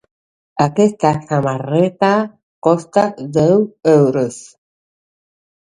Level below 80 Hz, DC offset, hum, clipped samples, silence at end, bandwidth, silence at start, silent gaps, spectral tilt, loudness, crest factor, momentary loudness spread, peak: -54 dBFS; under 0.1%; none; under 0.1%; 1.35 s; 11 kHz; 0.55 s; 2.43-2.62 s; -7 dB/octave; -15 LUFS; 16 dB; 8 LU; 0 dBFS